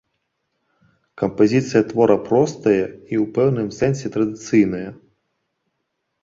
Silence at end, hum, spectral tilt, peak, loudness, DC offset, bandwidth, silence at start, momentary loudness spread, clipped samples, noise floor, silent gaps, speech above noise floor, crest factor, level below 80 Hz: 1.3 s; none; -7 dB/octave; -2 dBFS; -19 LUFS; under 0.1%; 7.8 kHz; 1.2 s; 8 LU; under 0.1%; -75 dBFS; none; 57 dB; 18 dB; -54 dBFS